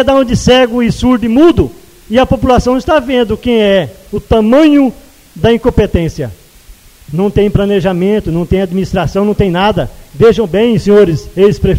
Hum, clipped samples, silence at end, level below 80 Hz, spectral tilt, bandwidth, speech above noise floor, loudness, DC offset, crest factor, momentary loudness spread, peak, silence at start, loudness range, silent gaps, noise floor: none; 0.4%; 0 s; -26 dBFS; -6.5 dB/octave; 16.5 kHz; 28 dB; -10 LUFS; under 0.1%; 10 dB; 7 LU; 0 dBFS; 0 s; 3 LU; none; -38 dBFS